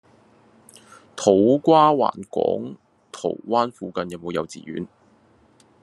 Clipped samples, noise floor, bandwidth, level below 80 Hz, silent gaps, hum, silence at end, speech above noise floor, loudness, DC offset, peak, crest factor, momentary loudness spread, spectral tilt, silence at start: under 0.1%; -57 dBFS; 12 kHz; -68 dBFS; none; none; 0.95 s; 37 dB; -21 LUFS; under 0.1%; -2 dBFS; 20 dB; 19 LU; -6 dB/octave; 1.15 s